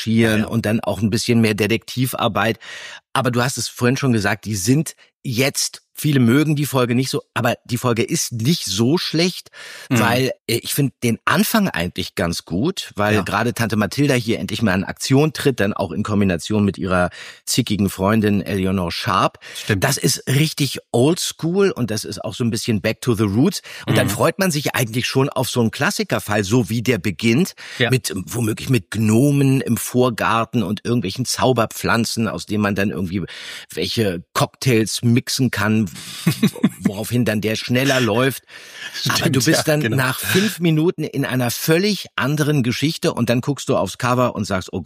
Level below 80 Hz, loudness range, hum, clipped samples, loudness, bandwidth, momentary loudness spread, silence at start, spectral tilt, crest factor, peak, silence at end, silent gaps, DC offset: -52 dBFS; 2 LU; none; under 0.1%; -19 LUFS; 15.5 kHz; 6 LU; 0 s; -5 dB/octave; 18 dB; -2 dBFS; 0 s; 5.14-5.20 s, 10.41-10.45 s; under 0.1%